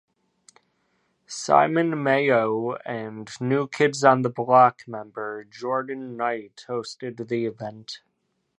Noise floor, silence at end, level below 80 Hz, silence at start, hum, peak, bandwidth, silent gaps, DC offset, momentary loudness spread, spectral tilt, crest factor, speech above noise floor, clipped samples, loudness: -74 dBFS; 0.6 s; -74 dBFS; 1.3 s; none; -2 dBFS; 11 kHz; none; under 0.1%; 17 LU; -5.5 dB/octave; 22 dB; 51 dB; under 0.1%; -23 LUFS